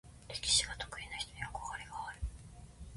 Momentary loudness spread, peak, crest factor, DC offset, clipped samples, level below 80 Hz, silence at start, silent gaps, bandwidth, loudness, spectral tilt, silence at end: 20 LU; -16 dBFS; 24 dB; under 0.1%; under 0.1%; -50 dBFS; 0.05 s; none; 11.5 kHz; -37 LUFS; -0.5 dB/octave; 0 s